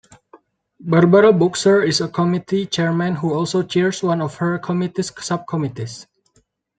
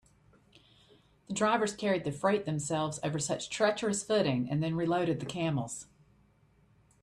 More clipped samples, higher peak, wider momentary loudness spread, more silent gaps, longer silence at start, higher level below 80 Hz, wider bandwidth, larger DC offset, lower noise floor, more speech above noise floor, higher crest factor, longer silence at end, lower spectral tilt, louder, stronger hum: neither; first, 0 dBFS vs -14 dBFS; first, 12 LU vs 5 LU; neither; second, 0.8 s vs 1.3 s; first, -60 dBFS vs -66 dBFS; second, 9.4 kHz vs 12.5 kHz; neither; second, -62 dBFS vs -66 dBFS; first, 45 dB vs 35 dB; about the same, 18 dB vs 18 dB; second, 0.75 s vs 1.2 s; about the same, -6 dB/octave vs -5 dB/octave; first, -18 LUFS vs -31 LUFS; neither